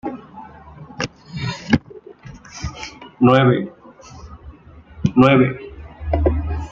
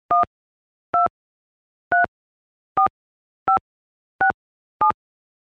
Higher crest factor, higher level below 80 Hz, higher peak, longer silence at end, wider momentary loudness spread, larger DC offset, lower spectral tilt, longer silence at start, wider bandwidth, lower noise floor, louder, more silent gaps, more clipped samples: about the same, 18 dB vs 18 dB; first, -34 dBFS vs -60 dBFS; first, -2 dBFS vs -6 dBFS; second, 0 s vs 0.5 s; first, 26 LU vs 6 LU; neither; about the same, -7 dB/octave vs -7 dB/octave; about the same, 0.05 s vs 0.1 s; first, 7.4 kHz vs 4.8 kHz; second, -42 dBFS vs under -90 dBFS; first, -18 LUFS vs -22 LUFS; second, none vs 0.27-0.93 s, 1.10-1.91 s, 2.08-2.75 s, 2.90-3.46 s, 3.61-4.19 s, 4.34-4.80 s; neither